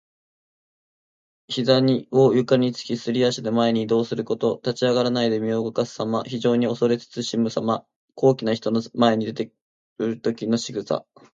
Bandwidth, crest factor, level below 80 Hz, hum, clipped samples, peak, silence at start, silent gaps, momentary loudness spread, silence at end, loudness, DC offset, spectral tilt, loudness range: 7.8 kHz; 20 dB; -66 dBFS; none; under 0.1%; -4 dBFS; 1.5 s; 7.96-8.08 s, 9.61-9.96 s; 9 LU; 0.3 s; -22 LUFS; under 0.1%; -6 dB/octave; 3 LU